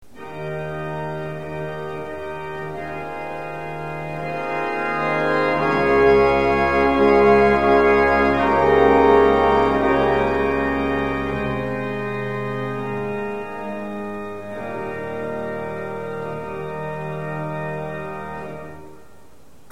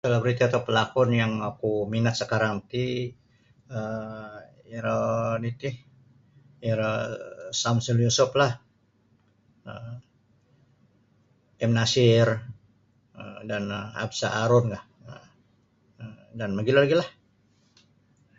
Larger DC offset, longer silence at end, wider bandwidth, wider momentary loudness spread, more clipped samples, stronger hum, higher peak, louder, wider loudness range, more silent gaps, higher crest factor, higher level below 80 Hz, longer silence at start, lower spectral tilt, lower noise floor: first, 0.9% vs under 0.1%; second, 0.7 s vs 1.3 s; first, 10 kHz vs 7.8 kHz; second, 15 LU vs 22 LU; neither; neither; first, -2 dBFS vs -8 dBFS; first, -20 LUFS vs -25 LUFS; first, 14 LU vs 5 LU; neither; about the same, 18 dB vs 20 dB; first, -40 dBFS vs -60 dBFS; about the same, 0.15 s vs 0.05 s; first, -7 dB/octave vs -5.5 dB/octave; second, -51 dBFS vs -65 dBFS